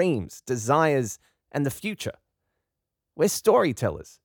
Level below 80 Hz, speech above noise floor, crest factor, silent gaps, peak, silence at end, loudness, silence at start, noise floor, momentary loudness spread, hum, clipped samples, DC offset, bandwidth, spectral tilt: -58 dBFS; 60 dB; 20 dB; none; -6 dBFS; 0.2 s; -25 LUFS; 0 s; -84 dBFS; 13 LU; none; under 0.1%; under 0.1%; over 20 kHz; -5 dB/octave